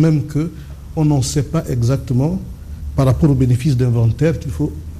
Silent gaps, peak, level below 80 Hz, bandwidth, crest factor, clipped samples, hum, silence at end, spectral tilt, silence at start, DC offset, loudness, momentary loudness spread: none; -4 dBFS; -32 dBFS; 14.5 kHz; 14 dB; under 0.1%; none; 0 s; -7.5 dB/octave; 0 s; under 0.1%; -17 LUFS; 12 LU